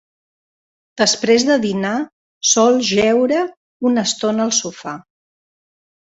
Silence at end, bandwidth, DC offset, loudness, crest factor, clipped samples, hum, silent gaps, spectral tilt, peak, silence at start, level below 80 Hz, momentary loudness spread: 1.1 s; 8.4 kHz; under 0.1%; -16 LUFS; 16 dB; under 0.1%; none; 2.12-2.41 s, 3.57-3.80 s; -3 dB/octave; -2 dBFS; 0.95 s; -60 dBFS; 14 LU